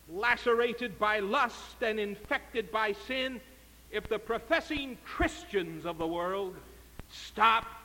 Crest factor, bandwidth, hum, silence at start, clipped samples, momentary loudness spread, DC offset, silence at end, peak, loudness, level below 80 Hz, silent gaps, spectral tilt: 22 dB; 17 kHz; none; 0.05 s; under 0.1%; 14 LU; under 0.1%; 0 s; -12 dBFS; -31 LUFS; -52 dBFS; none; -4 dB/octave